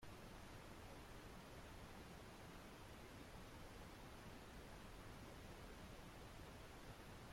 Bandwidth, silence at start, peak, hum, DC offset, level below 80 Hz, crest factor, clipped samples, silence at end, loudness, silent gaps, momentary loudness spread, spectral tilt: 16.5 kHz; 0 s; -44 dBFS; none; under 0.1%; -64 dBFS; 12 dB; under 0.1%; 0 s; -59 LUFS; none; 1 LU; -4.5 dB/octave